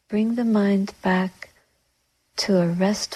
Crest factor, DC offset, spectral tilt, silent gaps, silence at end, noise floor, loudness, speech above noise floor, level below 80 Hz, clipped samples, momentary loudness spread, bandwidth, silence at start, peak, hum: 14 dB; under 0.1%; -5.5 dB/octave; none; 0 s; -69 dBFS; -22 LUFS; 48 dB; -58 dBFS; under 0.1%; 10 LU; 13.5 kHz; 0.1 s; -8 dBFS; none